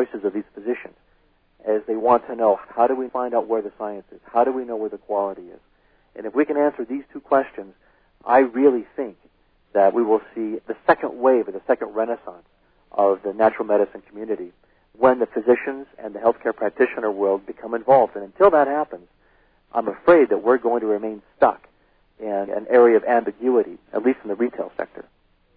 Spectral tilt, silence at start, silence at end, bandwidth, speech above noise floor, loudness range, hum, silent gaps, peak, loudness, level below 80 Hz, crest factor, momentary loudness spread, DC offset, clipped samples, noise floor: -10 dB/octave; 0 s; 0.55 s; 4.7 kHz; 41 dB; 5 LU; none; none; -4 dBFS; -21 LUFS; -60 dBFS; 18 dB; 15 LU; under 0.1%; under 0.1%; -61 dBFS